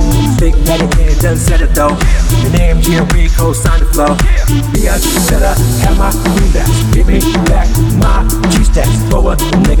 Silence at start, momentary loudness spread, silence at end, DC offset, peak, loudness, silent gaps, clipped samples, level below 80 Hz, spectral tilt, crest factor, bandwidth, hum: 0 s; 1 LU; 0 s; 0.3%; 0 dBFS; -11 LUFS; none; under 0.1%; -10 dBFS; -5.5 dB/octave; 8 dB; 18 kHz; none